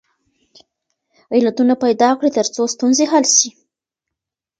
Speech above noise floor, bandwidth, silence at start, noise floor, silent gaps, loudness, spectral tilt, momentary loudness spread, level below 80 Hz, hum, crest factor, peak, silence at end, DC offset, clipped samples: 69 dB; 10 kHz; 1.3 s; -84 dBFS; none; -15 LUFS; -2 dB/octave; 7 LU; -68 dBFS; none; 18 dB; 0 dBFS; 1.1 s; under 0.1%; under 0.1%